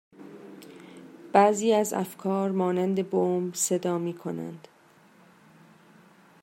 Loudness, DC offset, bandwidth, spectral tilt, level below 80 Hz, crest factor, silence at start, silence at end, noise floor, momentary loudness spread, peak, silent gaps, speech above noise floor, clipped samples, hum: -26 LUFS; under 0.1%; 16 kHz; -5 dB/octave; -78 dBFS; 24 dB; 0.2 s; 1.85 s; -58 dBFS; 25 LU; -4 dBFS; none; 32 dB; under 0.1%; none